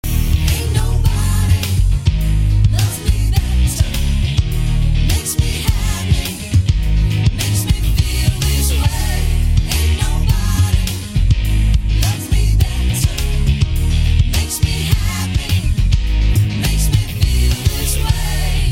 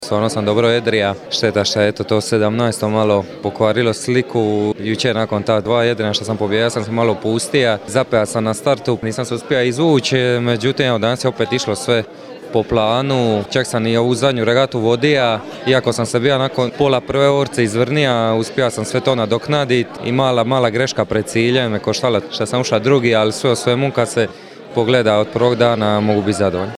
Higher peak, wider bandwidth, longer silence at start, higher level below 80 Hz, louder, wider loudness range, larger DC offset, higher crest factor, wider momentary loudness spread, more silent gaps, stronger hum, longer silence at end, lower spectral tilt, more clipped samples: about the same, 0 dBFS vs 0 dBFS; first, 16.5 kHz vs 14.5 kHz; about the same, 0.05 s vs 0 s; first, -16 dBFS vs -50 dBFS; about the same, -17 LUFS vs -16 LUFS; about the same, 1 LU vs 1 LU; neither; about the same, 14 dB vs 16 dB; about the same, 3 LU vs 4 LU; neither; neither; about the same, 0 s vs 0 s; about the same, -4.5 dB/octave vs -5 dB/octave; neither